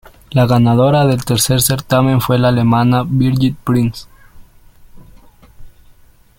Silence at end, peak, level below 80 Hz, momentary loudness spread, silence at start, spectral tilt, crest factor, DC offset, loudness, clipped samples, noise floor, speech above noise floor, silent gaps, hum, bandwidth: 0.7 s; 0 dBFS; -40 dBFS; 5 LU; 0.3 s; -6 dB/octave; 14 dB; under 0.1%; -13 LUFS; under 0.1%; -45 dBFS; 33 dB; none; none; 17 kHz